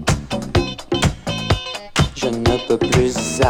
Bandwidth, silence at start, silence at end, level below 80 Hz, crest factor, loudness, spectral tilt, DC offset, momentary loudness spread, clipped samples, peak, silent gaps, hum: 17.5 kHz; 0 s; 0 s; -30 dBFS; 18 dB; -19 LUFS; -5 dB/octave; under 0.1%; 6 LU; under 0.1%; -2 dBFS; none; none